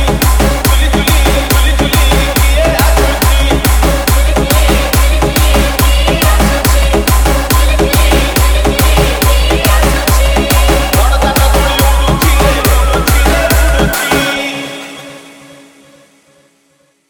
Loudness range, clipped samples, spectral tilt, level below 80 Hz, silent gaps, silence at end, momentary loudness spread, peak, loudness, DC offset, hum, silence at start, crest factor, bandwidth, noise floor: 2 LU; under 0.1%; -4 dB/octave; -12 dBFS; none; 1.8 s; 1 LU; 0 dBFS; -10 LUFS; under 0.1%; none; 0 s; 10 dB; 18 kHz; -53 dBFS